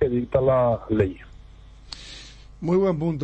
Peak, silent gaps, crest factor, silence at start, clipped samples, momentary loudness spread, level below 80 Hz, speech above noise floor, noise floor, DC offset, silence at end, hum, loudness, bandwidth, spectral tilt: -6 dBFS; none; 18 dB; 0 s; under 0.1%; 20 LU; -44 dBFS; 24 dB; -46 dBFS; under 0.1%; 0 s; none; -22 LUFS; 8.8 kHz; -8 dB/octave